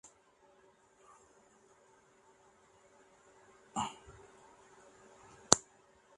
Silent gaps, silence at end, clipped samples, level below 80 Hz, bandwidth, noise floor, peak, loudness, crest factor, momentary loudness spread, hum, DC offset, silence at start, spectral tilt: none; 0.55 s; under 0.1%; -70 dBFS; 11.5 kHz; -67 dBFS; 0 dBFS; -32 LUFS; 42 dB; 31 LU; none; under 0.1%; 3.75 s; -1.5 dB/octave